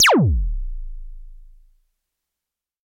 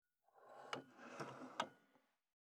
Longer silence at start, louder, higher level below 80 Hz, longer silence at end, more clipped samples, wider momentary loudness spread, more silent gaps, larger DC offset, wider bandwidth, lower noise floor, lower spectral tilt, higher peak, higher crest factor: second, 0 s vs 0.35 s; first, -19 LUFS vs -52 LUFS; first, -28 dBFS vs under -90 dBFS; first, 1.45 s vs 0.45 s; neither; first, 25 LU vs 12 LU; neither; neither; first, 16.5 kHz vs 13 kHz; first, -86 dBFS vs -79 dBFS; about the same, -4 dB/octave vs -3.5 dB/octave; first, -6 dBFS vs -28 dBFS; second, 16 dB vs 28 dB